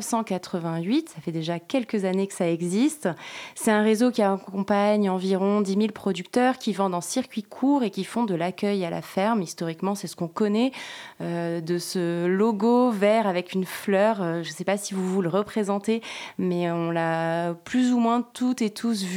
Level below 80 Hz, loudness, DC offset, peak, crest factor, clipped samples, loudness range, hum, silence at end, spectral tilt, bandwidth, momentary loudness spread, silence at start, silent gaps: -72 dBFS; -25 LUFS; under 0.1%; -8 dBFS; 16 dB; under 0.1%; 3 LU; none; 0 s; -5.5 dB/octave; 16.5 kHz; 8 LU; 0 s; none